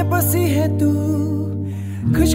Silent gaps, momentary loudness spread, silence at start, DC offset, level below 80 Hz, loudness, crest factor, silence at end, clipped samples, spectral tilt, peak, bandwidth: none; 8 LU; 0 s; under 0.1%; -36 dBFS; -19 LUFS; 14 dB; 0 s; under 0.1%; -6.5 dB/octave; -4 dBFS; 16 kHz